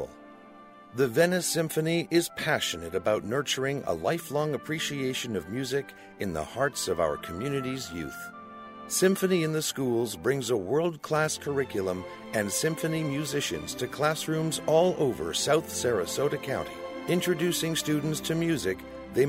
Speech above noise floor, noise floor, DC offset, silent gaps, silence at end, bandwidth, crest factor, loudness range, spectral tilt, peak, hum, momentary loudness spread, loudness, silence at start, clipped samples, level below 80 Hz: 22 dB; -50 dBFS; under 0.1%; none; 0 s; 16 kHz; 18 dB; 4 LU; -4 dB/octave; -10 dBFS; none; 9 LU; -28 LUFS; 0 s; under 0.1%; -58 dBFS